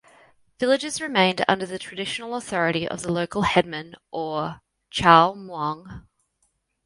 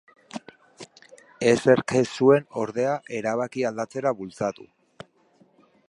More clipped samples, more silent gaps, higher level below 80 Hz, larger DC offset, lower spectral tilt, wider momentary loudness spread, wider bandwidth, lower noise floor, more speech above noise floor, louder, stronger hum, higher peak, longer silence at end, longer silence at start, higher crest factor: neither; neither; first, -54 dBFS vs -66 dBFS; neither; about the same, -4.5 dB/octave vs -5.5 dB/octave; second, 16 LU vs 21 LU; about the same, 11.5 kHz vs 11.5 kHz; first, -71 dBFS vs -61 dBFS; first, 48 dB vs 38 dB; about the same, -23 LUFS vs -24 LUFS; neither; first, 0 dBFS vs -4 dBFS; second, 0.85 s vs 1.25 s; first, 0.6 s vs 0.35 s; about the same, 24 dB vs 22 dB